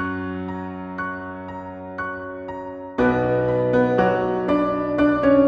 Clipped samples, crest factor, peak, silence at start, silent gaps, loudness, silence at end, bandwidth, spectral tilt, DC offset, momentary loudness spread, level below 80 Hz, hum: under 0.1%; 16 dB; -6 dBFS; 0 s; none; -22 LUFS; 0 s; 6.4 kHz; -9 dB/octave; under 0.1%; 14 LU; -46 dBFS; none